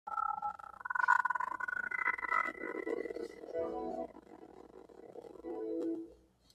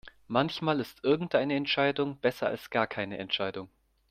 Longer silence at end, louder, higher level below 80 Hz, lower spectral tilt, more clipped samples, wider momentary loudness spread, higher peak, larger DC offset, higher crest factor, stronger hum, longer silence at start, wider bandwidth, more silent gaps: about the same, 0.4 s vs 0.45 s; second, -37 LUFS vs -30 LUFS; second, -72 dBFS vs -66 dBFS; about the same, -5 dB/octave vs -6 dB/octave; neither; first, 24 LU vs 6 LU; second, -16 dBFS vs -10 dBFS; neither; about the same, 24 dB vs 22 dB; neither; about the same, 0.05 s vs 0.05 s; second, 13.5 kHz vs 15.5 kHz; neither